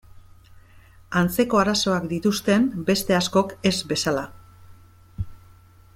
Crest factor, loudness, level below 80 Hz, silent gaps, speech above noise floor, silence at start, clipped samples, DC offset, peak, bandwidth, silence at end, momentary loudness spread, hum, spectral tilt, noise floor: 18 dB; -22 LUFS; -48 dBFS; none; 29 dB; 0.15 s; under 0.1%; under 0.1%; -6 dBFS; 16.5 kHz; 0.6 s; 16 LU; none; -4.5 dB/octave; -50 dBFS